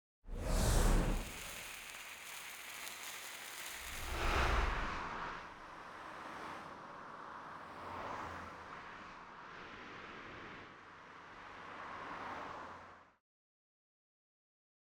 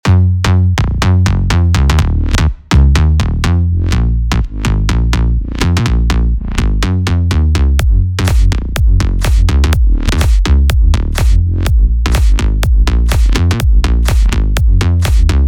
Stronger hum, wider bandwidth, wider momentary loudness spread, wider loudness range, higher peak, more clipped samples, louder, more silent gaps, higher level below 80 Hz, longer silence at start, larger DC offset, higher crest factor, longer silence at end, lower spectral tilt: neither; first, over 20 kHz vs 15 kHz; first, 17 LU vs 3 LU; first, 10 LU vs 2 LU; second, -20 dBFS vs 0 dBFS; neither; second, -43 LUFS vs -13 LUFS; neither; second, -44 dBFS vs -12 dBFS; first, 0.25 s vs 0.05 s; neither; first, 22 dB vs 10 dB; first, 1.95 s vs 0 s; second, -4 dB/octave vs -6 dB/octave